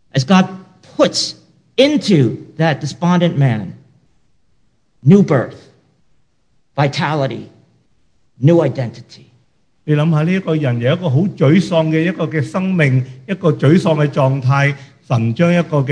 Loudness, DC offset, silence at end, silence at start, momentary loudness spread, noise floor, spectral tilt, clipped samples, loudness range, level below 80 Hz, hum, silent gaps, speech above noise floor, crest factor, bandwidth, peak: -15 LUFS; under 0.1%; 0 s; 0.15 s; 11 LU; -63 dBFS; -7 dB/octave; under 0.1%; 4 LU; -58 dBFS; none; none; 49 dB; 16 dB; 10 kHz; 0 dBFS